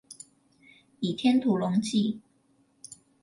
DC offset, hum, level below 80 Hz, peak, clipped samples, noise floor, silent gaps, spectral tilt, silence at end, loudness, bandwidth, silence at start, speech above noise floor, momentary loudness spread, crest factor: under 0.1%; none; -72 dBFS; -12 dBFS; under 0.1%; -67 dBFS; none; -6 dB/octave; 0.3 s; -27 LUFS; 11.5 kHz; 0.1 s; 41 dB; 23 LU; 18 dB